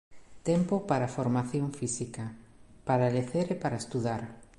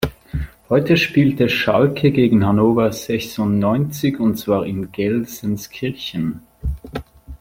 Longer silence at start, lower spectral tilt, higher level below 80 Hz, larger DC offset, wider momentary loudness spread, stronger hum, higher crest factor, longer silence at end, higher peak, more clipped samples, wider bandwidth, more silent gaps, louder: about the same, 0.1 s vs 0 s; about the same, -6.5 dB/octave vs -6.5 dB/octave; second, -60 dBFS vs -38 dBFS; neither; second, 10 LU vs 14 LU; neither; about the same, 18 dB vs 16 dB; about the same, 0.15 s vs 0.05 s; second, -12 dBFS vs -2 dBFS; neither; second, 11.5 kHz vs 16.5 kHz; neither; second, -31 LUFS vs -18 LUFS